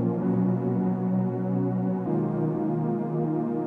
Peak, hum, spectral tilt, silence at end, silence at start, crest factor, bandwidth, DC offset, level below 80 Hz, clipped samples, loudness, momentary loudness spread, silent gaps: -14 dBFS; none; -12.5 dB/octave; 0 s; 0 s; 12 dB; 2.8 kHz; under 0.1%; -62 dBFS; under 0.1%; -27 LUFS; 2 LU; none